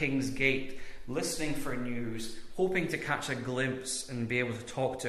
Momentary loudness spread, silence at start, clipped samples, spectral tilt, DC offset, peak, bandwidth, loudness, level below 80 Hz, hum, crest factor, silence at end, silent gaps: 10 LU; 0 s; under 0.1%; -4.5 dB/octave; under 0.1%; -14 dBFS; 14 kHz; -33 LUFS; -54 dBFS; none; 20 dB; 0 s; none